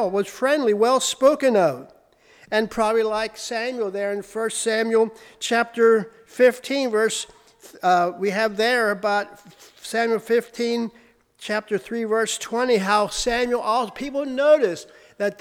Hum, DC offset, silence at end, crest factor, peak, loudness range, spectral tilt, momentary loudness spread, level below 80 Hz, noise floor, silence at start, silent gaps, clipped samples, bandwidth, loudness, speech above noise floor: none; under 0.1%; 0.1 s; 16 dB; -6 dBFS; 3 LU; -3.5 dB/octave; 9 LU; -54 dBFS; -53 dBFS; 0 s; none; under 0.1%; 16.5 kHz; -22 LUFS; 32 dB